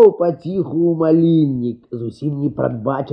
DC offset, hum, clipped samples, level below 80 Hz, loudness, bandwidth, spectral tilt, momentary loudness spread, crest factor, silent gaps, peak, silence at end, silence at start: under 0.1%; none; under 0.1%; -54 dBFS; -18 LUFS; 5.4 kHz; -11 dB/octave; 11 LU; 16 dB; none; 0 dBFS; 0 s; 0 s